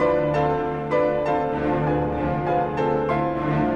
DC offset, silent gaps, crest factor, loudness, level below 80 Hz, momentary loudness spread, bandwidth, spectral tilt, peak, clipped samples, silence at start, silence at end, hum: under 0.1%; none; 12 dB; -23 LUFS; -42 dBFS; 2 LU; 7 kHz; -8.5 dB/octave; -10 dBFS; under 0.1%; 0 s; 0 s; none